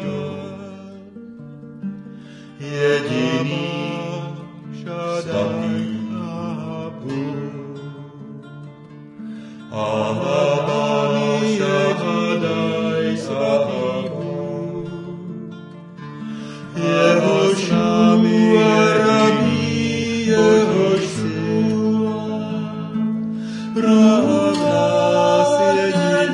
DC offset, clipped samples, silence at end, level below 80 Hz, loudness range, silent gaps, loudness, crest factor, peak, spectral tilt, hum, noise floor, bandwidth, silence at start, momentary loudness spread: under 0.1%; under 0.1%; 0 s; -60 dBFS; 11 LU; none; -18 LUFS; 16 dB; -2 dBFS; -6 dB/octave; none; -39 dBFS; 11 kHz; 0 s; 21 LU